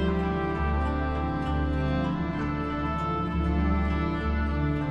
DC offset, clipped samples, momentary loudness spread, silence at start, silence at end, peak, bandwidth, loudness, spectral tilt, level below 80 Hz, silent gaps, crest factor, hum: under 0.1%; under 0.1%; 3 LU; 0 s; 0 s; -14 dBFS; 5.6 kHz; -28 LUFS; -8.5 dB/octave; -32 dBFS; none; 12 dB; none